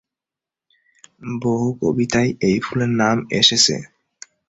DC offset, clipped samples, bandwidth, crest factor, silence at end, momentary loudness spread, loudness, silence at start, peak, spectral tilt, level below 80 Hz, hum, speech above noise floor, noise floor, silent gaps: under 0.1%; under 0.1%; 8.4 kHz; 20 dB; 0.6 s; 12 LU; -18 LUFS; 1.2 s; 0 dBFS; -3.5 dB/octave; -52 dBFS; none; 70 dB; -88 dBFS; none